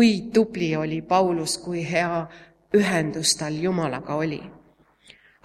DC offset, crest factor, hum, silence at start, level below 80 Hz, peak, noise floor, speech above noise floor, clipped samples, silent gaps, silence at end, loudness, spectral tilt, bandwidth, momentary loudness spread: under 0.1%; 18 dB; none; 0 s; -58 dBFS; -6 dBFS; -57 dBFS; 34 dB; under 0.1%; none; 0.9 s; -23 LUFS; -4.5 dB/octave; 15 kHz; 6 LU